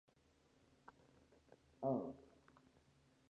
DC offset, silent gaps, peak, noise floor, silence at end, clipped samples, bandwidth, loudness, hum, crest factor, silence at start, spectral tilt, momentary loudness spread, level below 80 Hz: under 0.1%; none; -28 dBFS; -75 dBFS; 1.1 s; under 0.1%; 9.2 kHz; -45 LUFS; none; 22 dB; 1.8 s; -9 dB/octave; 24 LU; -80 dBFS